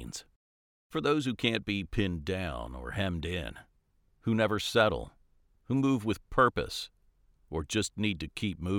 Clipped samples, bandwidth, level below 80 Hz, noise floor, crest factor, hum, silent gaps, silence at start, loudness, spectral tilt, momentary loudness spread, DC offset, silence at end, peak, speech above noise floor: under 0.1%; 17.5 kHz; -48 dBFS; -69 dBFS; 22 dB; none; 0.36-0.90 s; 0 s; -31 LUFS; -5 dB/octave; 12 LU; under 0.1%; 0 s; -10 dBFS; 39 dB